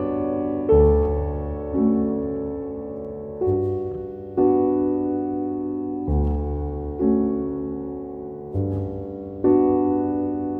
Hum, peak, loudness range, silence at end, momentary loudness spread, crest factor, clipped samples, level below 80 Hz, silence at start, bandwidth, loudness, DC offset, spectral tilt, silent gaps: none; -6 dBFS; 3 LU; 0 s; 13 LU; 16 dB; under 0.1%; -32 dBFS; 0 s; 3.2 kHz; -23 LUFS; under 0.1%; -13 dB/octave; none